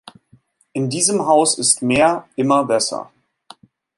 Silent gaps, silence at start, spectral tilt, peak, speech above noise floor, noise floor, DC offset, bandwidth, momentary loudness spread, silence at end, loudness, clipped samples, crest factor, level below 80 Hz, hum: none; 0.75 s; -3 dB/octave; 0 dBFS; 38 dB; -55 dBFS; under 0.1%; 11.5 kHz; 10 LU; 0.95 s; -16 LUFS; under 0.1%; 20 dB; -56 dBFS; none